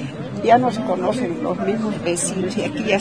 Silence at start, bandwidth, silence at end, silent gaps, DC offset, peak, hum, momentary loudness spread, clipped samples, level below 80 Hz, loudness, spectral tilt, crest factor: 0 s; 10.5 kHz; 0 s; none; 0.3%; -2 dBFS; none; 7 LU; under 0.1%; -54 dBFS; -20 LUFS; -5 dB/octave; 18 dB